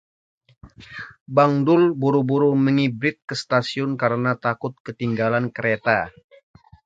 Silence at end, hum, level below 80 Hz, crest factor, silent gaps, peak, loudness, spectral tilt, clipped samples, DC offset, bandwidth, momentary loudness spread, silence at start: 0.75 s; none; -60 dBFS; 20 dB; 1.21-1.26 s, 4.80-4.85 s; -2 dBFS; -21 LUFS; -7 dB/octave; under 0.1%; under 0.1%; 7.8 kHz; 13 LU; 0.65 s